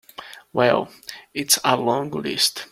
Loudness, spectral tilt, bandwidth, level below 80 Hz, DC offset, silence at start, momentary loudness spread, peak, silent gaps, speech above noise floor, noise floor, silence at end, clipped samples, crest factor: -20 LUFS; -2.5 dB/octave; 16.5 kHz; -62 dBFS; under 0.1%; 0.2 s; 19 LU; -2 dBFS; none; 20 dB; -41 dBFS; 0.05 s; under 0.1%; 20 dB